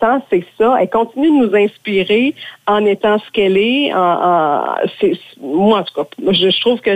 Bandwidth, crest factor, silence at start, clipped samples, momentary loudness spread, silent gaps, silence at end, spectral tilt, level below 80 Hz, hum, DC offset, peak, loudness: 9 kHz; 10 dB; 0 s; under 0.1%; 6 LU; none; 0 s; -6.5 dB/octave; -54 dBFS; none; under 0.1%; -4 dBFS; -14 LUFS